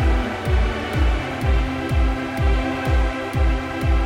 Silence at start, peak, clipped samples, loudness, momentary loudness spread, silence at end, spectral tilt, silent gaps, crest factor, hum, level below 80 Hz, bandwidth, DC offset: 0 s; -8 dBFS; under 0.1%; -22 LUFS; 2 LU; 0 s; -7 dB/octave; none; 12 dB; none; -22 dBFS; 11.5 kHz; under 0.1%